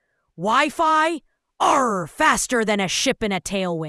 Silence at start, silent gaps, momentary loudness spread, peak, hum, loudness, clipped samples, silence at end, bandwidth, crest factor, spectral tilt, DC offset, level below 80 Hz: 0.4 s; none; 6 LU; -2 dBFS; none; -20 LUFS; under 0.1%; 0 s; 12 kHz; 18 dB; -3 dB/octave; under 0.1%; -50 dBFS